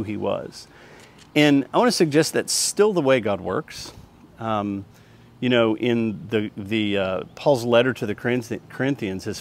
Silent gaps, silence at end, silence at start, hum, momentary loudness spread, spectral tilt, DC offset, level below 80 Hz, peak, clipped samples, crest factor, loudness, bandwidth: none; 0 s; 0 s; none; 12 LU; -4.5 dB/octave; under 0.1%; -60 dBFS; -2 dBFS; under 0.1%; 20 dB; -22 LUFS; 16 kHz